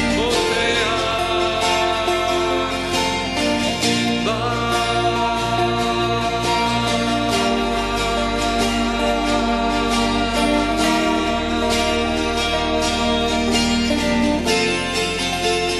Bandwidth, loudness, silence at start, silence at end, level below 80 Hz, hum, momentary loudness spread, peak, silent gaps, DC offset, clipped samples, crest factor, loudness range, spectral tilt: 12.5 kHz; -19 LUFS; 0 s; 0 s; -34 dBFS; none; 2 LU; -6 dBFS; none; under 0.1%; under 0.1%; 14 dB; 1 LU; -3.5 dB/octave